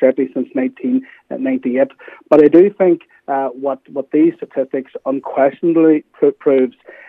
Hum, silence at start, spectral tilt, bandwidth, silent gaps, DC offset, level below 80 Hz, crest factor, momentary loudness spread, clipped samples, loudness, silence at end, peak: none; 0 s; -9.5 dB/octave; 3.9 kHz; none; under 0.1%; -66 dBFS; 16 dB; 12 LU; under 0.1%; -16 LUFS; 0.4 s; 0 dBFS